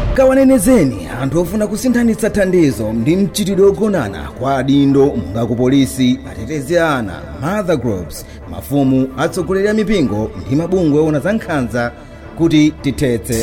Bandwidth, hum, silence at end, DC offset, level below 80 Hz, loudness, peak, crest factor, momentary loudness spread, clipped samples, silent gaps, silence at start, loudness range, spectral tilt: 16.5 kHz; none; 0 s; under 0.1%; -32 dBFS; -15 LUFS; -2 dBFS; 12 dB; 10 LU; under 0.1%; none; 0 s; 3 LU; -6 dB/octave